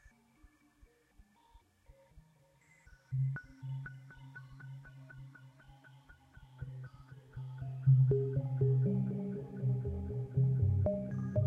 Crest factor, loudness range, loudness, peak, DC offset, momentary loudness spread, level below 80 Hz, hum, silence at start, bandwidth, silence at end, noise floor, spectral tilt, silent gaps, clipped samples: 18 dB; 18 LU; -34 LUFS; -18 dBFS; under 0.1%; 22 LU; -60 dBFS; none; 2.15 s; 3.1 kHz; 0 s; -67 dBFS; -11 dB/octave; none; under 0.1%